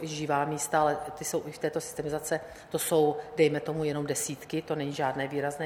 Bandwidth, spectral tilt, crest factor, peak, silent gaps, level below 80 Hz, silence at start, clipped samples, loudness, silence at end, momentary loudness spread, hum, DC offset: 17 kHz; -4.5 dB/octave; 18 dB; -12 dBFS; none; -62 dBFS; 0 s; under 0.1%; -30 LUFS; 0 s; 7 LU; none; under 0.1%